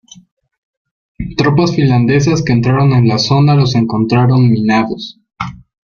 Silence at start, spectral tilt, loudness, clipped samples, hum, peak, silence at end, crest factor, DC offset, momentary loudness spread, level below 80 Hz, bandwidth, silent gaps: 1.2 s; -7 dB/octave; -11 LUFS; under 0.1%; none; 0 dBFS; 0.35 s; 12 dB; under 0.1%; 15 LU; -40 dBFS; 7 kHz; none